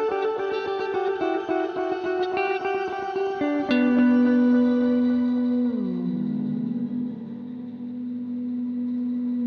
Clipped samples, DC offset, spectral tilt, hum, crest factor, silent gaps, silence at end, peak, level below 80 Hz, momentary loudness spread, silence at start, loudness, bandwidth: under 0.1%; under 0.1%; -8 dB/octave; none; 12 dB; none; 0 s; -10 dBFS; -64 dBFS; 13 LU; 0 s; -24 LUFS; 6.2 kHz